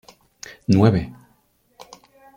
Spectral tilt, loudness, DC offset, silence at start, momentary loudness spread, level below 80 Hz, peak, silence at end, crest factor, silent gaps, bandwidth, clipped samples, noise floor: -7.5 dB/octave; -19 LUFS; under 0.1%; 0.7 s; 24 LU; -50 dBFS; -2 dBFS; 1.25 s; 22 dB; none; 15 kHz; under 0.1%; -62 dBFS